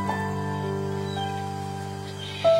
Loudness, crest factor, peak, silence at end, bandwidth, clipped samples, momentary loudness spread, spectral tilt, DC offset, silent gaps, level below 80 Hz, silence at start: -30 LUFS; 18 dB; -10 dBFS; 0 s; 16 kHz; under 0.1%; 6 LU; -6 dB/octave; under 0.1%; none; -60 dBFS; 0 s